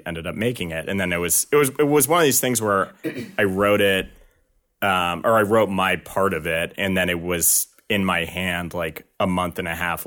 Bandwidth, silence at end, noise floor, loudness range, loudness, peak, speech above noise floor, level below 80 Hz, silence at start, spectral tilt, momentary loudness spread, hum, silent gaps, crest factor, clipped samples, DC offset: 19 kHz; 0 s; -64 dBFS; 3 LU; -21 LUFS; -6 dBFS; 43 dB; -50 dBFS; 0.05 s; -3.5 dB/octave; 9 LU; none; none; 16 dB; under 0.1%; under 0.1%